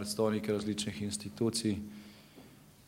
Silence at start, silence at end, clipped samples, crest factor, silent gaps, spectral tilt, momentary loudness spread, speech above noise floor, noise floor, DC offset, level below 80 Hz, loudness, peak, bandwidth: 0 s; 0.05 s; under 0.1%; 18 dB; none; -4.5 dB/octave; 21 LU; 22 dB; -56 dBFS; under 0.1%; -68 dBFS; -34 LUFS; -18 dBFS; 16 kHz